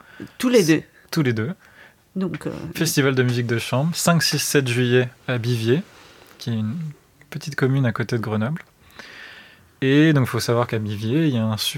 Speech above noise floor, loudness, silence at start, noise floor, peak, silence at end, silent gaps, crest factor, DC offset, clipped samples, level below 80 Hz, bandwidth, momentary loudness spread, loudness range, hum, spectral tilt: 27 dB; -21 LUFS; 0.15 s; -47 dBFS; -4 dBFS; 0 s; none; 18 dB; under 0.1%; under 0.1%; -60 dBFS; 17 kHz; 16 LU; 6 LU; none; -5 dB/octave